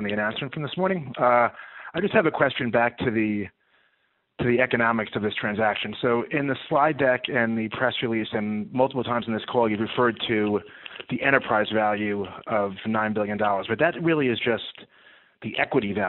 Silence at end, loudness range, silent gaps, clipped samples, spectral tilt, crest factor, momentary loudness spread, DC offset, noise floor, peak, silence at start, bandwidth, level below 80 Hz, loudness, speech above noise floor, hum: 0 s; 2 LU; none; under 0.1%; -3.5 dB/octave; 22 dB; 8 LU; under 0.1%; -70 dBFS; -2 dBFS; 0 s; 4.2 kHz; -60 dBFS; -24 LUFS; 46 dB; none